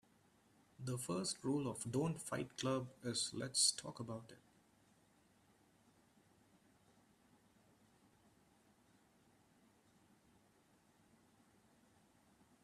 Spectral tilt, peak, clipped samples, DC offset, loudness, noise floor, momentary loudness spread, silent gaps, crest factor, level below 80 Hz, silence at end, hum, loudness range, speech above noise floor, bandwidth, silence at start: -3.5 dB/octave; -22 dBFS; under 0.1%; under 0.1%; -41 LUFS; -73 dBFS; 15 LU; none; 26 dB; -80 dBFS; 8.25 s; none; 15 LU; 31 dB; 14 kHz; 0.8 s